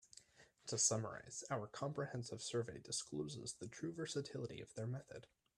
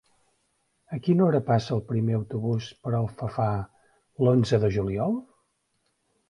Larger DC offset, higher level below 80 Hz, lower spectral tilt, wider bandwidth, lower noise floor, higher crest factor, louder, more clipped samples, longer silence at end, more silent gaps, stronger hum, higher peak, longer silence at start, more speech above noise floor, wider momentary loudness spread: neither; second, -78 dBFS vs -52 dBFS; second, -3.5 dB/octave vs -8.5 dB/octave; first, 13 kHz vs 10.5 kHz; second, -68 dBFS vs -73 dBFS; first, 24 dB vs 18 dB; second, -44 LUFS vs -26 LUFS; neither; second, 0.3 s vs 1.05 s; neither; neither; second, -22 dBFS vs -8 dBFS; second, 0.15 s vs 0.9 s; second, 23 dB vs 49 dB; first, 14 LU vs 9 LU